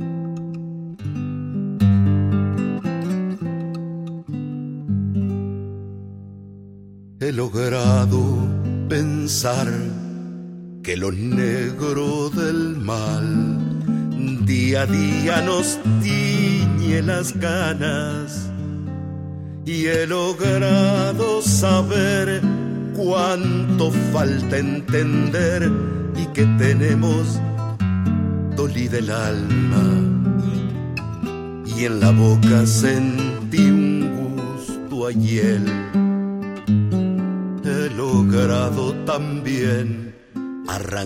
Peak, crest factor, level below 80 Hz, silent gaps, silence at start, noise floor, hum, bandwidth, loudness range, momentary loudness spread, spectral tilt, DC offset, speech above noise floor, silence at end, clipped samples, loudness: -4 dBFS; 16 dB; -48 dBFS; none; 0 s; -41 dBFS; none; 16 kHz; 5 LU; 12 LU; -6 dB/octave; under 0.1%; 23 dB; 0 s; under 0.1%; -20 LUFS